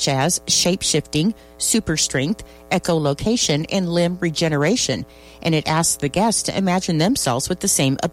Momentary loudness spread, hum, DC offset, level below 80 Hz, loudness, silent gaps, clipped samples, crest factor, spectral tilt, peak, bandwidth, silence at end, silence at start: 6 LU; none; under 0.1%; -44 dBFS; -19 LUFS; none; under 0.1%; 14 dB; -3.5 dB/octave; -6 dBFS; 16 kHz; 0 s; 0 s